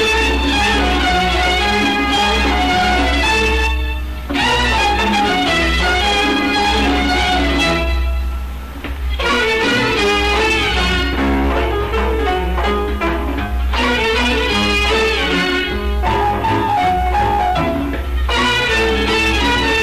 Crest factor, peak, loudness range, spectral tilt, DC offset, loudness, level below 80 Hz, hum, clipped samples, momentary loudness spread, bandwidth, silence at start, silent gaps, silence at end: 6 dB; -10 dBFS; 2 LU; -4.5 dB/octave; 0.8%; -15 LUFS; -22 dBFS; none; under 0.1%; 6 LU; 14 kHz; 0 s; none; 0 s